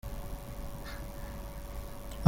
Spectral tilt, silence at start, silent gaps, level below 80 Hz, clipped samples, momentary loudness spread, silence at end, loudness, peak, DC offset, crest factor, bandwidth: -5.5 dB/octave; 0.05 s; none; -42 dBFS; under 0.1%; 1 LU; 0 s; -44 LUFS; -4 dBFS; under 0.1%; 30 dB; 17 kHz